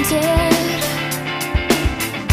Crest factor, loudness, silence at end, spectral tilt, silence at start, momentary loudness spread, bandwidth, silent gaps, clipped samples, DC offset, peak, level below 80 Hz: 16 dB; -18 LUFS; 0 s; -4 dB/octave; 0 s; 6 LU; 15.5 kHz; none; under 0.1%; under 0.1%; -2 dBFS; -28 dBFS